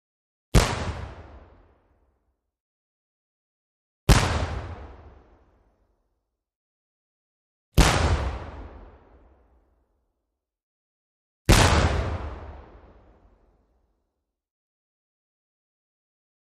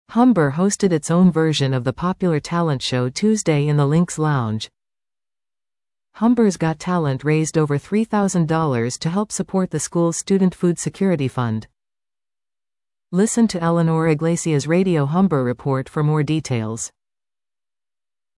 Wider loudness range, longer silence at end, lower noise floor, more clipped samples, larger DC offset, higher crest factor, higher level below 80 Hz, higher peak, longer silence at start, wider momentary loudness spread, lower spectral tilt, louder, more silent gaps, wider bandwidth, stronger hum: first, 12 LU vs 4 LU; first, 3.85 s vs 1.5 s; second, -82 dBFS vs under -90 dBFS; neither; neither; first, 26 dB vs 14 dB; first, -32 dBFS vs -54 dBFS; first, -2 dBFS vs -6 dBFS; first, 0.55 s vs 0.1 s; first, 23 LU vs 6 LU; second, -4.5 dB/octave vs -6 dB/octave; second, -23 LUFS vs -19 LUFS; first, 2.60-4.07 s, 6.56-7.72 s, 10.63-11.45 s vs none; about the same, 13 kHz vs 12 kHz; neither